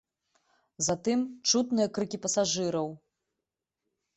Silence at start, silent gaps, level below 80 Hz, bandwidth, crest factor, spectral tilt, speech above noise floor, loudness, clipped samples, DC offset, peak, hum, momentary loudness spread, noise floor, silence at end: 0.8 s; none; -68 dBFS; 8.4 kHz; 20 dB; -3.5 dB/octave; 59 dB; -29 LUFS; under 0.1%; under 0.1%; -12 dBFS; none; 6 LU; -87 dBFS; 1.2 s